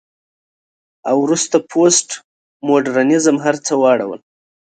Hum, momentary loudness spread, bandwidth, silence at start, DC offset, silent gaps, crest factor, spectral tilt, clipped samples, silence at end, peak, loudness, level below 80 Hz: none; 15 LU; 9.6 kHz; 1.05 s; under 0.1%; 2.24-2.60 s; 16 dB; -3.5 dB/octave; under 0.1%; 0.55 s; 0 dBFS; -15 LUFS; -66 dBFS